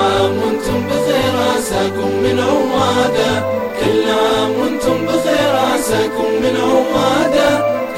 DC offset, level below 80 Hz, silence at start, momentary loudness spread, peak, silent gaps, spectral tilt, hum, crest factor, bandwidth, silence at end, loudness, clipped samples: 0.5%; -40 dBFS; 0 s; 4 LU; -2 dBFS; none; -4.5 dB/octave; none; 12 dB; 16.5 kHz; 0 s; -15 LUFS; under 0.1%